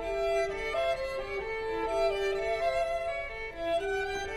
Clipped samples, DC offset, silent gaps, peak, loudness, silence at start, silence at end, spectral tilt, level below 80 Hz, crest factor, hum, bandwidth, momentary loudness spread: under 0.1%; under 0.1%; none; -18 dBFS; -32 LUFS; 0 s; 0 s; -4 dB/octave; -48 dBFS; 14 dB; none; 13.5 kHz; 5 LU